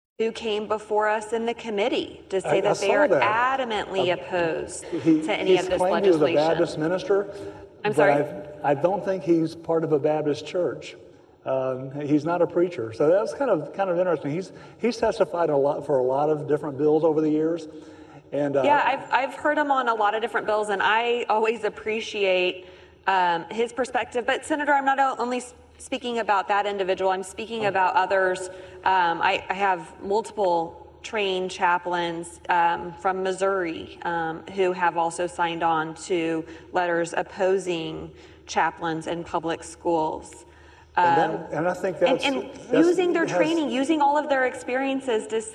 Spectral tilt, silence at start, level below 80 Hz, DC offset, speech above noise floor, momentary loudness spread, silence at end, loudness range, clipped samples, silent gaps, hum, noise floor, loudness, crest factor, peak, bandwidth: -5 dB/octave; 0.2 s; -60 dBFS; under 0.1%; 26 dB; 9 LU; 0 s; 3 LU; under 0.1%; none; none; -50 dBFS; -24 LUFS; 18 dB; -6 dBFS; 12 kHz